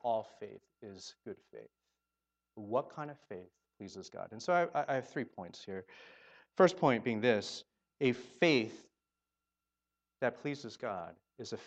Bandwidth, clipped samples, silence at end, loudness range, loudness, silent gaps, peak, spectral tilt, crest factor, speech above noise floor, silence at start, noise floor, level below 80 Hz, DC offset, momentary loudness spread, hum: 8.6 kHz; under 0.1%; 0 s; 12 LU; -35 LUFS; none; -12 dBFS; -5.5 dB/octave; 24 dB; over 54 dB; 0.05 s; under -90 dBFS; -82 dBFS; under 0.1%; 22 LU; none